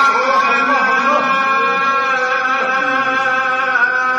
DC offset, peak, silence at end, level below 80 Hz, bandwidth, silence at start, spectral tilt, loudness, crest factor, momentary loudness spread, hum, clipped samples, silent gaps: under 0.1%; -2 dBFS; 0 s; -66 dBFS; 10.5 kHz; 0 s; -2.5 dB/octave; -14 LUFS; 12 dB; 2 LU; none; under 0.1%; none